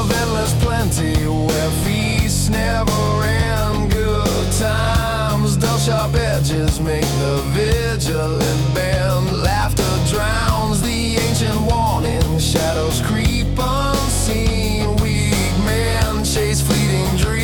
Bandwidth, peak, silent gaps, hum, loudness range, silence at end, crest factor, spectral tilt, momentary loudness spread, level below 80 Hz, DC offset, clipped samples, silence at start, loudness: 19 kHz; -4 dBFS; none; none; 0 LU; 0 s; 12 dB; -5 dB/octave; 2 LU; -24 dBFS; under 0.1%; under 0.1%; 0 s; -18 LUFS